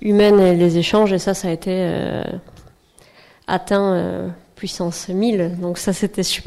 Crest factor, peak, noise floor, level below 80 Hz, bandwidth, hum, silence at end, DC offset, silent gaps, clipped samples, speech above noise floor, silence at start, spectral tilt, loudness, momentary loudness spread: 12 dB; -6 dBFS; -51 dBFS; -46 dBFS; 14.5 kHz; none; 0.05 s; under 0.1%; none; under 0.1%; 33 dB; 0 s; -5.5 dB/octave; -18 LUFS; 16 LU